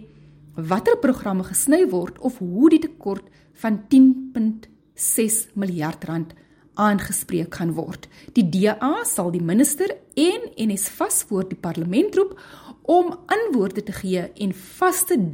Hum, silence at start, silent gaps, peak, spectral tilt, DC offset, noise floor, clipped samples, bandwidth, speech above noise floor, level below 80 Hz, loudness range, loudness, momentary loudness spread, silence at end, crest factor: none; 0 s; none; -4 dBFS; -5 dB/octave; under 0.1%; -47 dBFS; under 0.1%; 17 kHz; 27 dB; -56 dBFS; 4 LU; -21 LUFS; 12 LU; 0 s; 16 dB